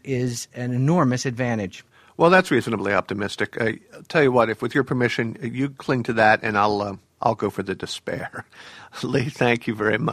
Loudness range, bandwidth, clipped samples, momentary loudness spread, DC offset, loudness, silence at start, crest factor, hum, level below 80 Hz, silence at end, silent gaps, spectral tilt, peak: 4 LU; 14.5 kHz; under 0.1%; 13 LU; under 0.1%; -22 LUFS; 0.05 s; 20 dB; none; -58 dBFS; 0 s; none; -6 dB/octave; -2 dBFS